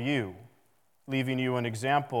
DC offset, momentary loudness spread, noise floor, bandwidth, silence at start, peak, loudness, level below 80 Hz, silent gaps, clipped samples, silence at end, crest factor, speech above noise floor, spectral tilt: under 0.1%; 6 LU; -71 dBFS; 16.5 kHz; 0 s; -12 dBFS; -30 LUFS; -78 dBFS; none; under 0.1%; 0 s; 18 dB; 41 dB; -6 dB/octave